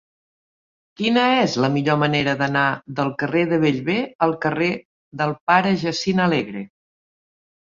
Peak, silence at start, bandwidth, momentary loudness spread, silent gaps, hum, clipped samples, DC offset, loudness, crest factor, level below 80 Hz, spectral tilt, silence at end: -2 dBFS; 1 s; 7.6 kHz; 8 LU; 4.15-4.19 s, 4.85-5.11 s, 5.41-5.47 s; none; under 0.1%; under 0.1%; -20 LUFS; 18 dB; -58 dBFS; -6 dB/octave; 1 s